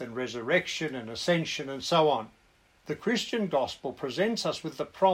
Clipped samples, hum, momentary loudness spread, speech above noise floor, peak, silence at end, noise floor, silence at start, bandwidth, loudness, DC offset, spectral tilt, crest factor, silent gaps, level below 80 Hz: under 0.1%; none; 10 LU; 34 dB; -10 dBFS; 0 s; -63 dBFS; 0 s; 16 kHz; -29 LUFS; under 0.1%; -4.5 dB/octave; 18 dB; none; -66 dBFS